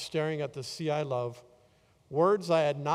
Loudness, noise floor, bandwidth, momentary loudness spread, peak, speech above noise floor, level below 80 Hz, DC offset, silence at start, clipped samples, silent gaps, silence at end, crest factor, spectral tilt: -30 LUFS; -64 dBFS; 15 kHz; 10 LU; -14 dBFS; 35 dB; -72 dBFS; under 0.1%; 0 s; under 0.1%; none; 0 s; 18 dB; -6 dB/octave